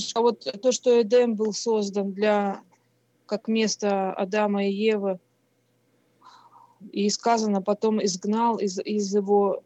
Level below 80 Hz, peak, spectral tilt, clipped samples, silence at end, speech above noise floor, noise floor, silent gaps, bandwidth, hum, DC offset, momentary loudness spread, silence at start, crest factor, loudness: under -90 dBFS; -10 dBFS; -4.5 dB/octave; under 0.1%; 0.05 s; 44 dB; -68 dBFS; none; 8.4 kHz; none; under 0.1%; 7 LU; 0 s; 16 dB; -24 LUFS